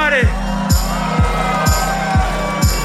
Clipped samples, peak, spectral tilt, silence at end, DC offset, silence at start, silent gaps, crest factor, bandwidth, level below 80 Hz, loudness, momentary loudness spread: under 0.1%; -4 dBFS; -4.5 dB/octave; 0 s; under 0.1%; 0 s; none; 12 dB; 16 kHz; -20 dBFS; -16 LUFS; 3 LU